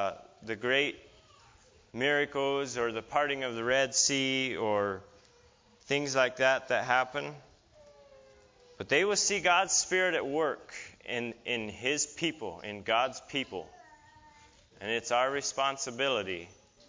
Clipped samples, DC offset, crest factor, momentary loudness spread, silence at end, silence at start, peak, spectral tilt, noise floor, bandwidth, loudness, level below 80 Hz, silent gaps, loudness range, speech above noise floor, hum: under 0.1%; under 0.1%; 22 dB; 15 LU; 0.35 s; 0 s; -10 dBFS; -2 dB/octave; -62 dBFS; 7.8 kHz; -30 LUFS; -66 dBFS; none; 5 LU; 32 dB; none